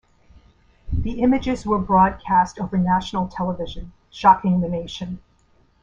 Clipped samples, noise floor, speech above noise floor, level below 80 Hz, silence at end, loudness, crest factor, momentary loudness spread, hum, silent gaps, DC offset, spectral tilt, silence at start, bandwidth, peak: under 0.1%; -58 dBFS; 38 dB; -38 dBFS; 0.65 s; -21 LUFS; 20 dB; 16 LU; none; none; under 0.1%; -7 dB/octave; 0.85 s; 7.8 kHz; -2 dBFS